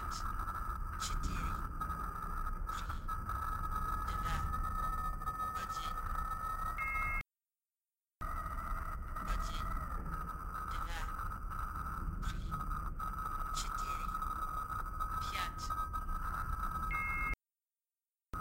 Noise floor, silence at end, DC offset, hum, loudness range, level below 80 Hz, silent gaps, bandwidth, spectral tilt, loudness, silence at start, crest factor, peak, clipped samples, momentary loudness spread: under -90 dBFS; 0 s; under 0.1%; none; 3 LU; -42 dBFS; none; 16 kHz; -4 dB/octave; -40 LUFS; 0 s; 16 dB; -24 dBFS; under 0.1%; 5 LU